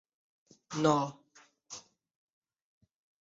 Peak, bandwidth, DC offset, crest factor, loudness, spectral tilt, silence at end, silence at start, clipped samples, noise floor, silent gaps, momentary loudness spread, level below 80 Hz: -14 dBFS; 7.6 kHz; under 0.1%; 24 dB; -31 LUFS; -5.5 dB/octave; 1.4 s; 0.7 s; under 0.1%; -61 dBFS; none; 20 LU; -74 dBFS